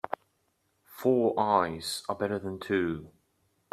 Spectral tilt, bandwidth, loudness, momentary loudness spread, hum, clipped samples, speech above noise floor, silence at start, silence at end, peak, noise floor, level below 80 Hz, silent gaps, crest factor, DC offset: -5 dB/octave; 14.5 kHz; -29 LUFS; 12 LU; none; under 0.1%; 46 dB; 0.9 s; 0.65 s; -10 dBFS; -74 dBFS; -66 dBFS; none; 22 dB; under 0.1%